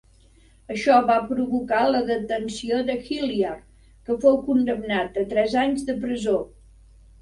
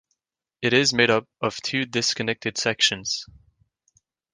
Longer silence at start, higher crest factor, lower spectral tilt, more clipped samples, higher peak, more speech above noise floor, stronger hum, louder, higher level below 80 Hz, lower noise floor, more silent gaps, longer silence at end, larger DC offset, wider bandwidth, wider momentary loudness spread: about the same, 0.7 s vs 0.6 s; about the same, 18 dB vs 22 dB; first, -5 dB/octave vs -2.5 dB/octave; neither; about the same, -6 dBFS vs -4 dBFS; second, 32 dB vs 59 dB; neither; about the same, -23 LUFS vs -22 LUFS; first, -52 dBFS vs -60 dBFS; second, -54 dBFS vs -83 dBFS; neither; second, 0.75 s vs 1.1 s; neither; about the same, 11.5 kHz vs 10.5 kHz; about the same, 9 LU vs 9 LU